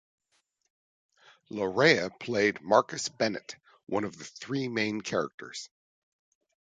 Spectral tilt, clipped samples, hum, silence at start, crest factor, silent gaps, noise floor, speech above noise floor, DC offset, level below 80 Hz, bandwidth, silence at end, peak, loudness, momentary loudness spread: -4 dB/octave; under 0.1%; none; 1.5 s; 24 dB; 5.34-5.38 s; -75 dBFS; 47 dB; under 0.1%; -70 dBFS; 9.4 kHz; 1.1 s; -6 dBFS; -28 LUFS; 18 LU